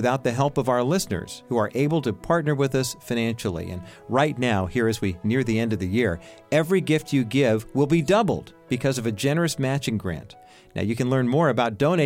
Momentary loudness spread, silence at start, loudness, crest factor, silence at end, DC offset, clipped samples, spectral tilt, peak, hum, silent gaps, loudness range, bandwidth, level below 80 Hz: 8 LU; 0 s; -24 LUFS; 16 dB; 0 s; under 0.1%; under 0.1%; -6 dB/octave; -8 dBFS; none; none; 2 LU; 16.5 kHz; -50 dBFS